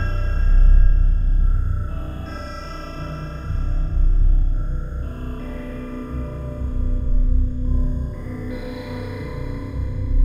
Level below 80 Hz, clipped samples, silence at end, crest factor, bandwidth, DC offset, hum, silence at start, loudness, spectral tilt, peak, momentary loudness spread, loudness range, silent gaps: -20 dBFS; under 0.1%; 0 s; 14 dB; 5.8 kHz; under 0.1%; none; 0 s; -25 LUFS; -8.5 dB/octave; -4 dBFS; 11 LU; 3 LU; none